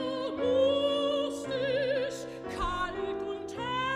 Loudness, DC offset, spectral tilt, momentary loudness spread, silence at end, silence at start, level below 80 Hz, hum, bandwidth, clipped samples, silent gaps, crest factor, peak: -31 LUFS; under 0.1%; -4.5 dB/octave; 10 LU; 0 s; 0 s; -50 dBFS; none; 12.5 kHz; under 0.1%; none; 14 dB; -16 dBFS